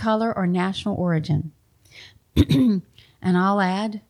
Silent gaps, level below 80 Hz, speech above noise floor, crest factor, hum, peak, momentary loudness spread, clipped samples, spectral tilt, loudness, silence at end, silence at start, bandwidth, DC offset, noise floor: none; -42 dBFS; 28 dB; 20 dB; none; -2 dBFS; 8 LU; under 0.1%; -7.5 dB/octave; -22 LUFS; 0.1 s; 0 s; 13.5 kHz; under 0.1%; -48 dBFS